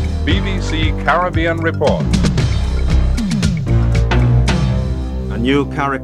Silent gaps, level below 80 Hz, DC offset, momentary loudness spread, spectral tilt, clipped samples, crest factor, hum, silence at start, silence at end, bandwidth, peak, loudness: none; -20 dBFS; under 0.1%; 5 LU; -6.5 dB/octave; under 0.1%; 14 dB; none; 0 s; 0 s; 11 kHz; 0 dBFS; -16 LUFS